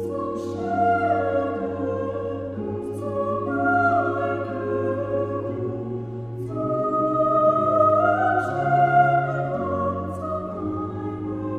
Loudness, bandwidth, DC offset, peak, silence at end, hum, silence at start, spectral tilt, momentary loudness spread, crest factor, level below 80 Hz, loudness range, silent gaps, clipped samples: -23 LUFS; 10.5 kHz; under 0.1%; -6 dBFS; 0 s; none; 0 s; -8.5 dB/octave; 11 LU; 16 dB; -54 dBFS; 5 LU; none; under 0.1%